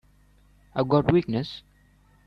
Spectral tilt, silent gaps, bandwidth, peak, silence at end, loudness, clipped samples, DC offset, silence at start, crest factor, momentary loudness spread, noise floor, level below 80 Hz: -9 dB/octave; none; 6.4 kHz; -8 dBFS; 0.65 s; -25 LUFS; under 0.1%; under 0.1%; 0.75 s; 20 dB; 15 LU; -59 dBFS; -52 dBFS